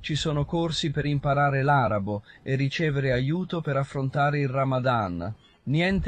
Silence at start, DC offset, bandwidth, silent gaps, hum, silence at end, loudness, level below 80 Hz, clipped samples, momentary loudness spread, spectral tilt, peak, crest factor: 0 s; under 0.1%; 9 kHz; none; none; 0 s; -26 LUFS; -46 dBFS; under 0.1%; 8 LU; -6.5 dB/octave; -10 dBFS; 16 dB